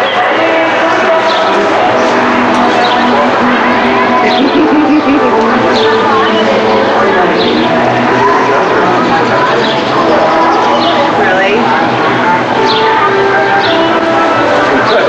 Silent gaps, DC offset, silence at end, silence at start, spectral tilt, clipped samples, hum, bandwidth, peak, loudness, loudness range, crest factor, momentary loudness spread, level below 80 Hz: none; under 0.1%; 0 s; 0 s; -5 dB/octave; under 0.1%; none; 9.2 kHz; 0 dBFS; -8 LUFS; 0 LU; 8 dB; 1 LU; -44 dBFS